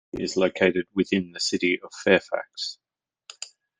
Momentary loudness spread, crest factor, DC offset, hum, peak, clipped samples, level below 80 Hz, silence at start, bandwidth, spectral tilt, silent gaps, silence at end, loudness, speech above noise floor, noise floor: 12 LU; 22 dB; under 0.1%; none; -4 dBFS; under 0.1%; -64 dBFS; 0.15 s; 9.8 kHz; -4 dB/octave; none; 0.35 s; -24 LUFS; 27 dB; -51 dBFS